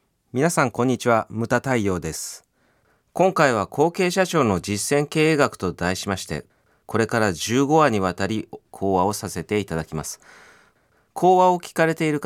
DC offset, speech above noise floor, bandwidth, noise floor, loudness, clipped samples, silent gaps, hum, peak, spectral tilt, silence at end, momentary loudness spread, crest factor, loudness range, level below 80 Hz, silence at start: under 0.1%; 42 dB; 17 kHz; -63 dBFS; -21 LUFS; under 0.1%; none; none; -2 dBFS; -5 dB/octave; 0 s; 13 LU; 20 dB; 3 LU; -52 dBFS; 0.35 s